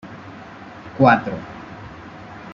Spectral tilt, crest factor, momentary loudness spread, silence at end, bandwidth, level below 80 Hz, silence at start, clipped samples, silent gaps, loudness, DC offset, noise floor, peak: -8 dB/octave; 20 dB; 23 LU; 0 s; 7.2 kHz; -54 dBFS; 0.05 s; under 0.1%; none; -18 LUFS; under 0.1%; -38 dBFS; -2 dBFS